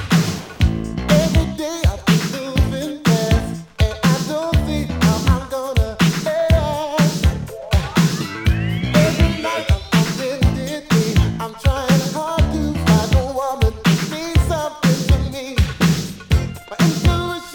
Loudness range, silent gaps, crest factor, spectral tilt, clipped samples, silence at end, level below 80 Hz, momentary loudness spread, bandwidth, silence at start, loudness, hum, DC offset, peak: 1 LU; none; 16 dB; -5.5 dB/octave; under 0.1%; 0 s; -26 dBFS; 5 LU; 20 kHz; 0 s; -18 LUFS; none; under 0.1%; 0 dBFS